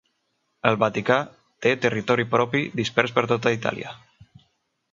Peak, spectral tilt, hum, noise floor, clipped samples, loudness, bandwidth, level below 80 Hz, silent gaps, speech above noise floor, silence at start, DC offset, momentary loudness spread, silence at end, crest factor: -2 dBFS; -5.5 dB/octave; none; -73 dBFS; under 0.1%; -23 LUFS; 7.6 kHz; -62 dBFS; none; 50 dB; 0.65 s; under 0.1%; 6 LU; 0.95 s; 24 dB